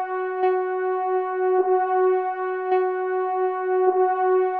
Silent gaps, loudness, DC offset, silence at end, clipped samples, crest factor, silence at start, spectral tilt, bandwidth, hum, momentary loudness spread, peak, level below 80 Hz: none; -22 LUFS; under 0.1%; 0 s; under 0.1%; 14 dB; 0 s; -7 dB/octave; 3.5 kHz; none; 5 LU; -8 dBFS; -80 dBFS